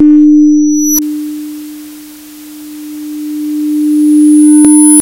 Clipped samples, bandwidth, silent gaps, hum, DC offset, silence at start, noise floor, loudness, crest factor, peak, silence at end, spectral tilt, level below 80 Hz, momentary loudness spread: 2%; over 20 kHz; none; none; under 0.1%; 0 s; -30 dBFS; -7 LUFS; 8 dB; 0 dBFS; 0 s; -3 dB/octave; -52 dBFS; 23 LU